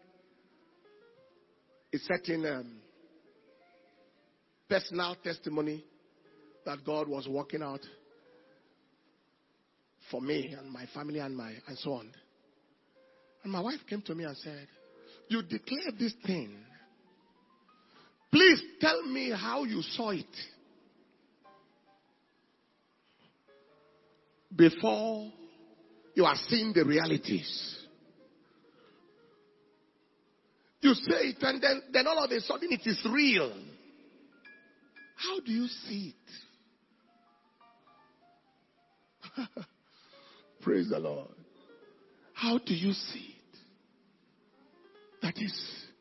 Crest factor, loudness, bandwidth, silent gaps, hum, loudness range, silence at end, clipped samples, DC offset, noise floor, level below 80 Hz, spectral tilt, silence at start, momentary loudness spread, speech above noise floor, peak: 26 dB; -31 LUFS; 6 kHz; none; none; 14 LU; 0.15 s; under 0.1%; under 0.1%; -73 dBFS; -76 dBFS; -3 dB/octave; 1.95 s; 20 LU; 42 dB; -8 dBFS